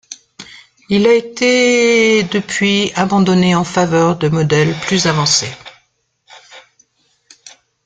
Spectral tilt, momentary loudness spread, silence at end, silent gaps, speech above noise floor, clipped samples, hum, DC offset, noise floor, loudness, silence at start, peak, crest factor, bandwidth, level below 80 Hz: -4.5 dB/octave; 13 LU; 0.35 s; none; 49 dB; under 0.1%; none; under 0.1%; -61 dBFS; -13 LUFS; 0.1 s; 0 dBFS; 14 dB; 9.4 kHz; -50 dBFS